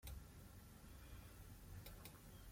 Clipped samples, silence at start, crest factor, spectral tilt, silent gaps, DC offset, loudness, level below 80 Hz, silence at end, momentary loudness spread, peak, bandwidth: under 0.1%; 0 s; 18 dB; -4.5 dB/octave; none; under 0.1%; -60 LUFS; -62 dBFS; 0 s; 4 LU; -40 dBFS; 16.5 kHz